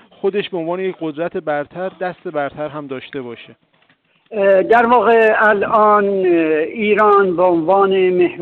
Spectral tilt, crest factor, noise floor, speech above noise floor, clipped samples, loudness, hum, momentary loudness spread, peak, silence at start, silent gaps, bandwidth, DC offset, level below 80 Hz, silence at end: -8 dB/octave; 12 dB; -57 dBFS; 42 dB; under 0.1%; -15 LUFS; none; 15 LU; -4 dBFS; 0.25 s; none; 4.4 kHz; under 0.1%; -58 dBFS; 0 s